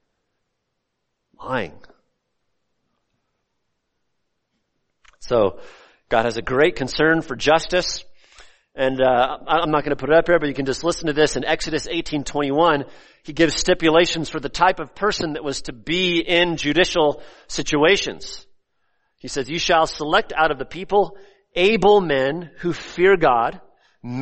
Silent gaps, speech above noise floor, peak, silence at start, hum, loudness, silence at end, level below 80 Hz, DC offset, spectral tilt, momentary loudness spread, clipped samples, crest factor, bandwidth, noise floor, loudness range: none; 57 dB; -2 dBFS; 1.4 s; none; -20 LUFS; 0 s; -44 dBFS; under 0.1%; -4 dB/octave; 12 LU; under 0.1%; 18 dB; 8.8 kHz; -76 dBFS; 10 LU